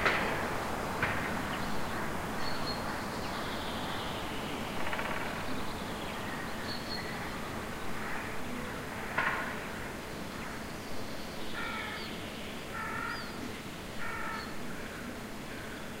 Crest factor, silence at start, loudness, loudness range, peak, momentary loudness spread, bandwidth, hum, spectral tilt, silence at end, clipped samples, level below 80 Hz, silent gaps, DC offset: 22 dB; 0 s; -37 LUFS; 4 LU; -14 dBFS; 8 LU; 16 kHz; none; -4 dB/octave; 0 s; under 0.1%; -50 dBFS; none; under 0.1%